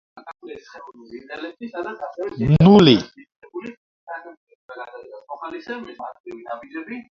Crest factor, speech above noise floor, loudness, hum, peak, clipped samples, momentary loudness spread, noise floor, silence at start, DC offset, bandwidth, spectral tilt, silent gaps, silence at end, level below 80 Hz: 22 dB; 18 dB; -17 LUFS; none; 0 dBFS; under 0.1%; 27 LU; -38 dBFS; 0.25 s; under 0.1%; 7.4 kHz; -7.5 dB/octave; 3.36-3.40 s, 3.77-4.07 s, 4.37-4.47 s, 4.55-4.69 s, 6.20-6.24 s; 0.1 s; -48 dBFS